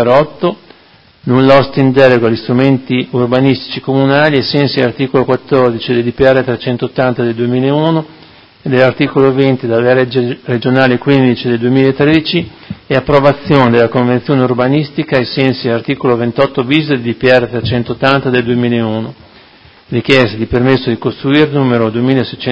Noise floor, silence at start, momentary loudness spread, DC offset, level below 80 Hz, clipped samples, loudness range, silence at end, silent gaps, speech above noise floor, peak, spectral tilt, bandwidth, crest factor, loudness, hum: -44 dBFS; 0 s; 7 LU; under 0.1%; -42 dBFS; 0.5%; 2 LU; 0 s; none; 33 dB; 0 dBFS; -8 dB/octave; 8 kHz; 12 dB; -11 LUFS; none